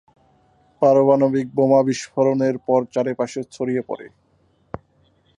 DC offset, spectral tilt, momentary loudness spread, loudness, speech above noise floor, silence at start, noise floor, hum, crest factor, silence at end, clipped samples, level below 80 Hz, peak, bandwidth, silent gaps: under 0.1%; -7 dB/octave; 19 LU; -19 LUFS; 42 dB; 0.8 s; -61 dBFS; none; 18 dB; 0.65 s; under 0.1%; -60 dBFS; -4 dBFS; 10.5 kHz; none